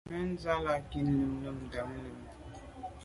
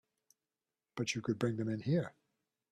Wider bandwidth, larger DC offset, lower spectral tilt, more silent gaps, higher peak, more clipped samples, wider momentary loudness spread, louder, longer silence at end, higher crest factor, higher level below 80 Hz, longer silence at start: about the same, 11.5 kHz vs 12.5 kHz; neither; first, -7.5 dB/octave vs -6 dB/octave; neither; about the same, -18 dBFS vs -18 dBFS; neither; first, 17 LU vs 10 LU; about the same, -35 LUFS vs -37 LUFS; second, 0 s vs 0.6 s; about the same, 18 dB vs 20 dB; first, -50 dBFS vs -74 dBFS; second, 0.05 s vs 0.95 s